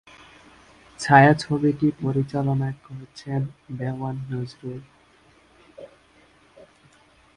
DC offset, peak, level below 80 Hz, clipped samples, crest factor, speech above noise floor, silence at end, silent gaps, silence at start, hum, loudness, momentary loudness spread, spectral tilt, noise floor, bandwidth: under 0.1%; 0 dBFS; -56 dBFS; under 0.1%; 24 dB; 34 dB; 1.5 s; none; 1 s; none; -22 LUFS; 22 LU; -7 dB/octave; -56 dBFS; 11 kHz